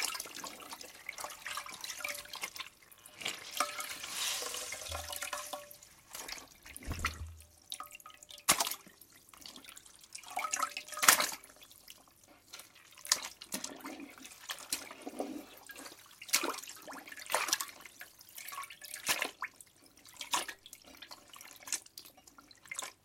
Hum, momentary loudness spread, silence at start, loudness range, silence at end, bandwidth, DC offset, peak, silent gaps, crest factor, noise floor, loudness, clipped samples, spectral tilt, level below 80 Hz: none; 20 LU; 0 s; 9 LU; 0.1 s; 16.5 kHz; under 0.1%; -4 dBFS; none; 36 dB; -62 dBFS; -36 LUFS; under 0.1%; 0 dB/octave; -62 dBFS